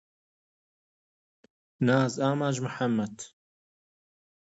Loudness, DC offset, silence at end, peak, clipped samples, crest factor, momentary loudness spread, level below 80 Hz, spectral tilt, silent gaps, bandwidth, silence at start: -28 LUFS; under 0.1%; 1.25 s; -12 dBFS; under 0.1%; 20 dB; 14 LU; -72 dBFS; -6 dB/octave; none; 8 kHz; 1.8 s